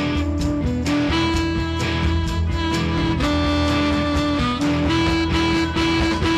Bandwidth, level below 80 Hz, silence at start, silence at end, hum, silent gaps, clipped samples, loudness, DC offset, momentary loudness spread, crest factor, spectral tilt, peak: 13 kHz; -28 dBFS; 0 s; 0 s; none; none; under 0.1%; -20 LUFS; under 0.1%; 3 LU; 12 dB; -5.5 dB/octave; -8 dBFS